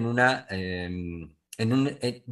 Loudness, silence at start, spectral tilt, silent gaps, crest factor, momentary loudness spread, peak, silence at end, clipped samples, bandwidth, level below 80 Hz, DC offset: -28 LUFS; 0 s; -6 dB/octave; none; 20 dB; 15 LU; -6 dBFS; 0 s; under 0.1%; 12.5 kHz; -56 dBFS; under 0.1%